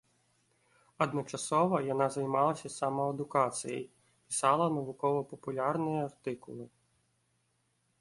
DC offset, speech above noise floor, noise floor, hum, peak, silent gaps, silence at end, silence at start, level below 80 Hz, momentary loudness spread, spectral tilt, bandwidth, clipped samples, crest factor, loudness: under 0.1%; 44 dB; -76 dBFS; none; -14 dBFS; none; 1.35 s; 1 s; -74 dBFS; 12 LU; -5.5 dB/octave; 11.5 kHz; under 0.1%; 20 dB; -32 LUFS